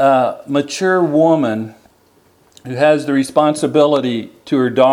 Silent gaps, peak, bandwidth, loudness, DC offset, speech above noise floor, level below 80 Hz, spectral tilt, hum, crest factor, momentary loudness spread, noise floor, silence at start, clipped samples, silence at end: none; 0 dBFS; 13 kHz; -15 LUFS; under 0.1%; 39 dB; -64 dBFS; -5.5 dB/octave; none; 14 dB; 9 LU; -53 dBFS; 0 s; under 0.1%; 0 s